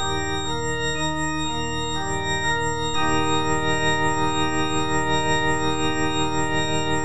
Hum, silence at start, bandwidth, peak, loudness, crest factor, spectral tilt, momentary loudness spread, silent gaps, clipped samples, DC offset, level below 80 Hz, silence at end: none; 0 s; 9.8 kHz; -8 dBFS; -23 LUFS; 14 dB; -3.5 dB/octave; 4 LU; none; under 0.1%; 4%; -40 dBFS; 0 s